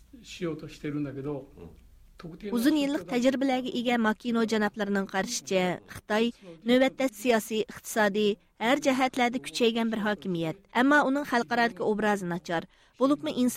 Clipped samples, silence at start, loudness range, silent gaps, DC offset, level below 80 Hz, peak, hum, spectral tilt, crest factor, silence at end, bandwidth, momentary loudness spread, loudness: under 0.1%; 0.15 s; 3 LU; none; under 0.1%; -60 dBFS; -12 dBFS; none; -4.5 dB/octave; 16 dB; 0 s; 16 kHz; 11 LU; -28 LUFS